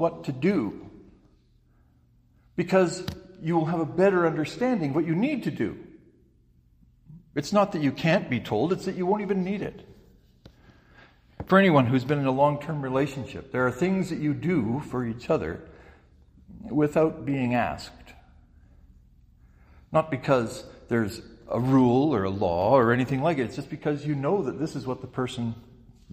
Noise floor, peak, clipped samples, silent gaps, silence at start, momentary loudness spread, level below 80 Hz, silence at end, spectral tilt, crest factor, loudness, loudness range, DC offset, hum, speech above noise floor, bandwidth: -61 dBFS; -6 dBFS; under 0.1%; none; 0 s; 13 LU; -56 dBFS; 0.55 s; -7 dB/octave; 20 dB; -26 LUFS; 6 LU; under 0.1%; none; 36 dB; 15 kHz